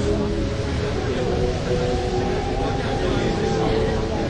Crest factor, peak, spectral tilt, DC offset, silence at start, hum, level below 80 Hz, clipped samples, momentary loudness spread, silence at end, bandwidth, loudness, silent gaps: 12 dB; -8 dBFS; -6.5 dB/octave; under 0.1%; 0 s; none; -30 dBFS; under 0.1%; 3 LU; 0 s; 11 kHz; -23 LUFS; none